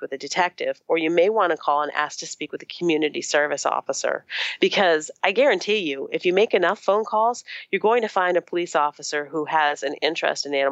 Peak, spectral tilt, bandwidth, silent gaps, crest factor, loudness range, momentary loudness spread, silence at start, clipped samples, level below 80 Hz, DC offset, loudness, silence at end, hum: -2 dBFS; -3 dB/octave; 9 kHz; none; 20 dB; 2 LU; 8 LU; 0 s; under 0.1%; -82 dBFS; under 0.1%; -22 LUFS; 0 s; none